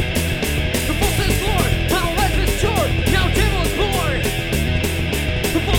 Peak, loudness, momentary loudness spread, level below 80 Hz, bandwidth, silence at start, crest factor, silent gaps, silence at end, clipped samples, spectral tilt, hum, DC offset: -4 dBFS; -19 LUFS; 3 LU; -24 dBFS; 17.5 kHz; 0 s; 14 dB; none; 0 s; under 0.1%; -4.5 dB/octave; none; under 0.1%